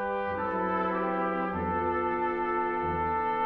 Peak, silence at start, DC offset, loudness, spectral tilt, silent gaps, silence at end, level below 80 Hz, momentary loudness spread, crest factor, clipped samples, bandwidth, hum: -18 dBFS; 0 s; under 0.1%; -29 LUFS; -9 dB/octave; none; 0 s; -52 dBFS; 2 LU; 12 dB; under 0.1%; 5.6 kHz; none